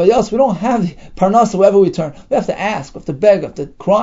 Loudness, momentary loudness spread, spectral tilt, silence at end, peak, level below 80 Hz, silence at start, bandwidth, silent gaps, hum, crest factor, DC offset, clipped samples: -14 LUFS; 12 LU; -6.5 dB/octave; 0 s; 0 dBFS; -42 dBFS; 0 s; 8 kHz; none; none; 14 dB; under 0.1%; under 0.1%